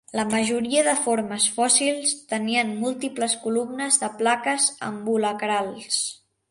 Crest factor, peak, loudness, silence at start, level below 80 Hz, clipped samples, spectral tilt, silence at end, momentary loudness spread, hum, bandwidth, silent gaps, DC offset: 20 dB; -4 dBFS; -23 LUFS; 0.15 s; -68 dBFS; under 0.1%; -2 dB/octave; 0.35 s; 8 LU; none; 11.5 kHz; none; under 0.1%